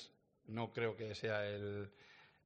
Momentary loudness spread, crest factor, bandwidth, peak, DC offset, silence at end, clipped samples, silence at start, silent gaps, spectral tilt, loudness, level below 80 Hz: 18 LU; 20 dB; 8.8 kHz; -24 dBFS; under 0.1%; 0.2 s; under 0.1%; 0 s; none; -6 dB/octave; -43 LUFS; -78 dBFS